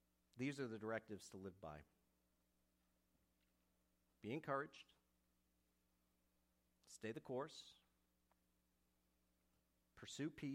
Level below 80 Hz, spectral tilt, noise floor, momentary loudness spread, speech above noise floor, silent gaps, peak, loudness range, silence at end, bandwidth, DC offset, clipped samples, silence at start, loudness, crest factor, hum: -82 dBFS; -5.5 dB/octave; -85 dBFS; 17 LU; 34 dB; none; -30 dBFS; 4 LU; 0 s; 15.5 kHz; under 0.1%; under 0.1%; 0.35 s; -51 LUFS; 24 dB; none